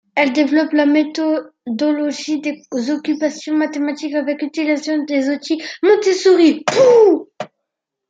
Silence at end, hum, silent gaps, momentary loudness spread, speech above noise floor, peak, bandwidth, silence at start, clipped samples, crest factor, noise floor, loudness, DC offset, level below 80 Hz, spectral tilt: 0.65 s; none; none; 11 LU; 63 dB; -2 dBFS; 7.8 kHz; 0.15 s; under 0.1%; 14 dB; -79 dBFS; -16 LUFS; under 0.1%; -70 dBFS; -4 dB/octave